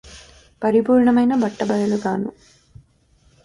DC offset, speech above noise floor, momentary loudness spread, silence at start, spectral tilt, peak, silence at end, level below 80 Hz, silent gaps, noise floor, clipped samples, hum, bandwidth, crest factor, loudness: under 0.1%; 40 dB; 10 LU; 0.05 s; -7 dB/octave; -6 dBFS; 1.15 s; -54 dBFS; none; -57 dBFS; under 0.1%; none; 11 kHz; 14 dB; -19 LUFS